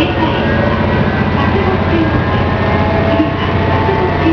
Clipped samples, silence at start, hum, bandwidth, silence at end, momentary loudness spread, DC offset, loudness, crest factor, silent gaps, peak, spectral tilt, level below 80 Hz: under 0.1%; 0 s; none; 5.4 kHz; 0 s; 1 LU; under 0.1%; -13 LUFS; 12 dB; none; 0 dBFS; -8.5 dB/octave; -26 dBFS